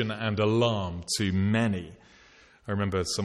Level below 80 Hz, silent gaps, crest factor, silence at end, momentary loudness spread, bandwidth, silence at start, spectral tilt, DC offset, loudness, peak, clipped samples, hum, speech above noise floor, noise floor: -54 dBFS; none; 16 dB; 0 s; 10 LU; 13 kHz; 0 s; -5 dB/octave; under 0.1%; -27 LUFS; -12 dBFS; under 0.1%; none; 30 dB; -57 dBFS